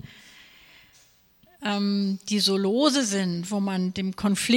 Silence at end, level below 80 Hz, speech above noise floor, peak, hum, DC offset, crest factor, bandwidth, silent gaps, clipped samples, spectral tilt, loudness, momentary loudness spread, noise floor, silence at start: 0 s; -62 dBFS; 35 dB; -8 dBFS; none; under 0.1%; 18 dB; 17 kHz; none; under 0.1%; -4.5 dB/octave; -25 LUFS; 7 LU; -59 dBFS; 0.05 s